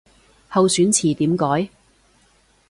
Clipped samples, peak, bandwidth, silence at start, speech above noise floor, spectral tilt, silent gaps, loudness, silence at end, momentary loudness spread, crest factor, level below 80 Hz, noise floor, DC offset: under 0.1%; -4 dBFS; 11.5 kHz; 0.5 s; 40 dB; -4.5 dB/octave; none; -18 LUFS; 1.05 s; 8 LU; 16 dB; -56 dBFS; -58 dBFS; under 0.1%